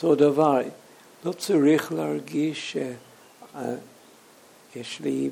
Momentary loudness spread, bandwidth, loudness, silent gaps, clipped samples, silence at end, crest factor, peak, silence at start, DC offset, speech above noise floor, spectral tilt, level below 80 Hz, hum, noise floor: 18 LU; 16.5 kHz; -25 LUFS; none; under 0.1%; 0 s; 18 dB; -8 dBFS; 0 s; under 0.1%; 29 dB; -5.5 dB/octave; -78 dBFS; none; -53 dBFS